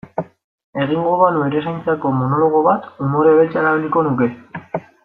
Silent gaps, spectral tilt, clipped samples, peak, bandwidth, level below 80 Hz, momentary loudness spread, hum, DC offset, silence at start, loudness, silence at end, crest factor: 0.44-0.73 s; -10 dB/octave; under 0.1%; -2 dBFS; 4.1 kHz; -60 dBFS; 15 LU; none; under 0.1%; 0.05 s; -16 LUFS; 0.25 s; 16 dB